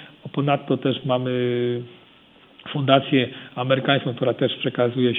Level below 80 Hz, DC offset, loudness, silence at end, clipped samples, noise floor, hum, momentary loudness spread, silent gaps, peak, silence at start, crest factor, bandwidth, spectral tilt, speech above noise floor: -68 dBFS; under 0.1%; -22 LUFS; 0 s; under 0.1%; -52 dBFS; none; 12 LU; none; 0 dBFS; 0 s; 22 dB; 4.1 kHz; -9.5 dB/octave; 30 dB